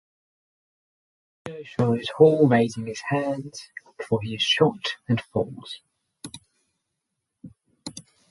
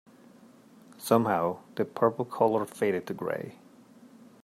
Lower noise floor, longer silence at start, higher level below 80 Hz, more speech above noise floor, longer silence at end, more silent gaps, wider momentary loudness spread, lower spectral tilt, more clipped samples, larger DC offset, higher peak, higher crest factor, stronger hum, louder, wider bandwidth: first, -81 dBFS vs -55 dBFS; first, 1.45 s vs 0.9 s; first, -62 dBFS vs -76 dBFS; first, 58 dB vs 27 dB; second, 0.3 s vs 0.9 s; neither; first, 23 LU vs 10 LU; about the same, -5.5 dB/octave vs -6 dB/octave; neither; neither; first, -2 dBFS vs -8 dBFS; about the same, 24 dB vs 22 dB; neither; first, -23 LUFS vs -28 LUFS; second, 11.5 kHz vs 16 kHz